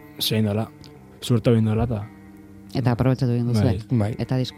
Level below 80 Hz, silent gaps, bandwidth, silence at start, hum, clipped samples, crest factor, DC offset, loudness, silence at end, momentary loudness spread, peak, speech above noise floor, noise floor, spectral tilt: -48 dBFS; none; 15.5 kHz; 0 s; none; under 0.1%; 18 dB; under 0.1%; -22 LUFS; 0 s; 11 LU; -4 dBFS; 23 dB; -44 dBFS; -7 dB/octave